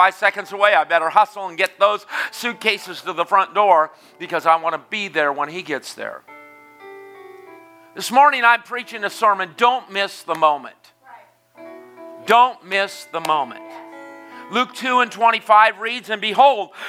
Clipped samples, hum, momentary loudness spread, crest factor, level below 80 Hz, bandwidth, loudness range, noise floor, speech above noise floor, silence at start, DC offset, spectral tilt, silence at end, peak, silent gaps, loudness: under 0.1%; none; 16 LU; 20 dB; -82 dBFS; 16 kHz; 5 LU; -47 dBFS; 28 dB; 0 s; under 0.1%; -2.5 dB/octave; 0 s; 0 dBFS; none; -18 LUFS